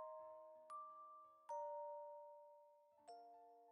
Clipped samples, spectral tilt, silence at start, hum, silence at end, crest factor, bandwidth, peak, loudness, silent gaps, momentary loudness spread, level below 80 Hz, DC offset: under 0.1%; -1.5 dB/octave; 0 s; none; 0 s; 16 dB; 6.2 kHz; -42 dBFS; -56 LUFS; none; 15 LU; under -90 dBFS; under 0.1%